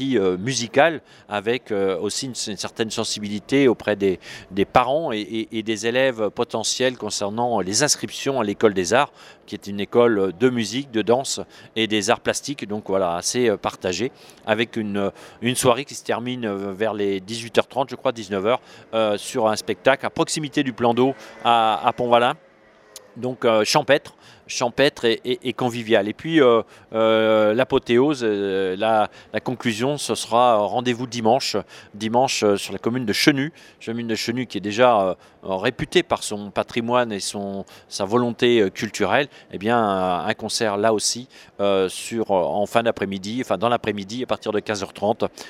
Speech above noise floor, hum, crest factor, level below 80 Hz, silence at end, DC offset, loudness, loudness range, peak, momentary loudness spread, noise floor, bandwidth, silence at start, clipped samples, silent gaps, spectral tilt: 26 dB; none; 22 dB; -58 dBFS; 0 s; under 0.1%; -21 LUFS; 3 LU; 0 dBFS; 10 LU; -48 dBFS; 16 kHz; 0 s; under 0.1%; none; -4 dB/octave